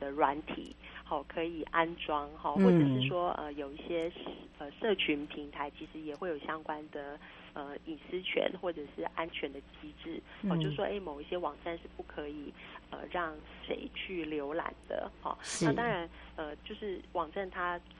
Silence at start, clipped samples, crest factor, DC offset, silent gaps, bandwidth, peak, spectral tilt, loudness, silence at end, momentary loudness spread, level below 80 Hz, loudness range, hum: 0 s; under 0.1%; 24 dB; under 0.1%; none; 9 kHz; -12 dBFS; -5.5 dB/octave; -36 LUFS; 0 s; 14 LU; -58 dBFS; 8 LU; none